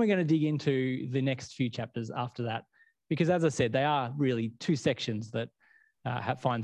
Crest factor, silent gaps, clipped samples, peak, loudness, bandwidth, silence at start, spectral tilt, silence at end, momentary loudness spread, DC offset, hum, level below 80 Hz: 18 dB; none; under 0.1%; -12 dBFS; -31 LUFS; 10.5 kHz; 0 s; -6.5 dB/octave; 0 s; 10 LU; under 0.1%; none; -64 dBFS